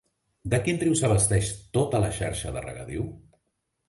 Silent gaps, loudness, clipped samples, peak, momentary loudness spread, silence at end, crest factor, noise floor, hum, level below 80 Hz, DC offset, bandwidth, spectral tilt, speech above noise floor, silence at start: none; -26 LUFS; under 0.1%; -10 dBFS; 14 LU; 0.7 s; 16 dB; -78 dBFS; none; -44 dBFS; under 0.1%; 11.5 kHz; -5 dB/octave; 52 dB; 0.45 s